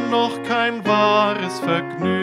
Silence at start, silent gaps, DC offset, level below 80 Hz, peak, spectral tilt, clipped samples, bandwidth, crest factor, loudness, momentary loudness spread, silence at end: 0 s; none; under 0.1%; -64 dBFS; -4 dBFS; -5.5 dB/octave; under 0.1%; 15.5 kHz; 16 dB; -19 LUFS; 6 LU; 0 s